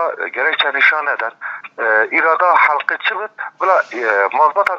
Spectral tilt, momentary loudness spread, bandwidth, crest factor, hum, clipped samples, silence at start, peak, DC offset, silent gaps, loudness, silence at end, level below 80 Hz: -2 dB/octave; 11 LU; 8.4 kHz; 16 dB; none; under 0.1%; 0 s; 0 dBFS; under 0.1%; none; -15 LUFS; 0 s; -72 dBFS